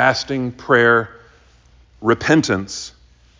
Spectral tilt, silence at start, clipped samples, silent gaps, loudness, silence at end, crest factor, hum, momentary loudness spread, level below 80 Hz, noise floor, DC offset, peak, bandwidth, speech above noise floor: -5 dB/octave; 0 s; under 0.1%; none; -17 LUFS; 0.5 s; 18 dB; none; 16 LU; -48 dBFS; -50 dBFS; under 0.1%; -2 dBFS; 7.6 kHz; 34 dB